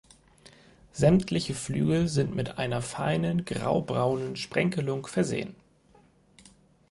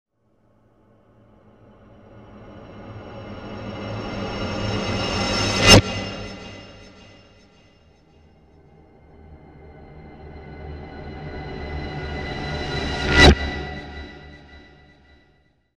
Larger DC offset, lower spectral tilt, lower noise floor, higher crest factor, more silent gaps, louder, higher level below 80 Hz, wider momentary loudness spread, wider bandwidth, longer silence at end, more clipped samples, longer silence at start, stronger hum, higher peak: neither; first, -6 dB/octave vs -4 dB/octave; about the same, -60 dBFS vs -63 dBFS; about the same, 20 dB vs 24 dB; neither; second, -28 LUFS vs -20 LUFS; second, -54 dBFS vs -34 dBFS; second, 7 LU vs 29 LU; second, 11.5 kHz vs 16 kHz; first, 1.35 s vs 1.15 s; neither; second, 0.95 s vs 2.1 s; neither; second, -8 dBFS vs 0 dBFS